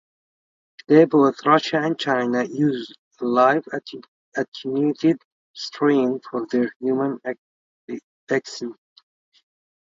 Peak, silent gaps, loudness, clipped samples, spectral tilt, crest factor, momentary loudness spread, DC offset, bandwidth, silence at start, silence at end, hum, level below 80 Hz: 0 dBFS; 2.99-3.11 s, 4.08-4.32 s, 4.48-4.52 s, 5.25-5.54 s, 6.76-6.80 s, 7.38-7.88 s, 8.04-8.27 s; -21 LUFS; under 0.1%; -6 dB/octave; 22 dB; 18 LU; under 0.1%; 7.6 kHz; 0.9 s; 1.3 s; none; -72 dBFS